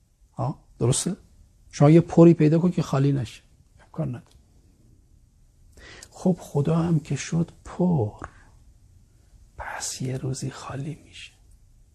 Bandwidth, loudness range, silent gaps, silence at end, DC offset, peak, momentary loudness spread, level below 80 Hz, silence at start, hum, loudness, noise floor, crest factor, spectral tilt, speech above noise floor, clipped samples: 12.5 kHz; 14 LU; none; 0.7 s; under 0.1%; -4 dBFS; 25 LU; -52 dBFS; 0.4 s; none; -23 LUFS; -56 dBFS; 20 dB; -7 dB/octave; 34 dB; under 0.1%